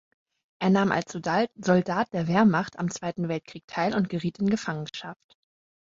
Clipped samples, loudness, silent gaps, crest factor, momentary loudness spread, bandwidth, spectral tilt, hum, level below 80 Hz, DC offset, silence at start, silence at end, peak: under 0.1%; -26 LUFS; 3.64-3.68 s; 20 dB; 12 LU; 7.8 kHz; -6 dB/octave; none; -64 dBFS; under 0.1%; 0.6 s; 0.7 s; -8 dBFS